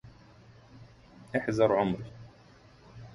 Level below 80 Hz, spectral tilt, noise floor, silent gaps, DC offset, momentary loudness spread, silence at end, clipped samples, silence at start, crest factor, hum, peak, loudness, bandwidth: -60 dBFS; -7 dB/octave; -56 dBFS; none; under 0.1%; 24 LU; 0 s; under 0.1%; 0.05 s; 22 dB; none; -12 dBFS; -29 LUFS; 11.5 kHz